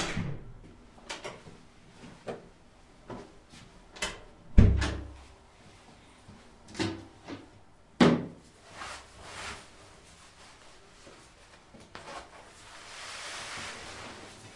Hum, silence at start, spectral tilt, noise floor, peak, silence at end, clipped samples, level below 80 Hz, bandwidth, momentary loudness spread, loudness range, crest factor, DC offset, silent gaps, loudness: none; 0 s; -5.5 dB/octave; -57 dBFS; -2 dBFS; 0 s; under 0.1%; -40 dBFS; 11.5 kHz; 28 LU; 15 LU; 32 dB; under 0.1%; none; -33 LUFS